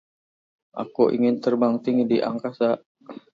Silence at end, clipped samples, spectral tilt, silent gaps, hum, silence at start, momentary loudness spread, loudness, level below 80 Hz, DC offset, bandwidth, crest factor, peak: 0.15 s; under 0.1%; -8 dB/octave; 2.86-2.95 s; none; 0.75 s; 16 LU; -23 LUFS; -72 dBFS; under 0.1%; 6.8 kHz; 18 dB; -4 dBFS